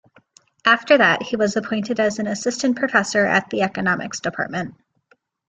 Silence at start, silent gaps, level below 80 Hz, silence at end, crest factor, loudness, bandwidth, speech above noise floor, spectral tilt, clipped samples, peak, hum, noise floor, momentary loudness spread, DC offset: 0.65 s; none; -62 dBFS; 0.75 s; 20 dB; -19 LUFS; 9.4 kHz; 42 dB; -4 dB/octave; under 0.1%; -2 dBFS; none; -62 dBFS; 11 LU; under 0.1%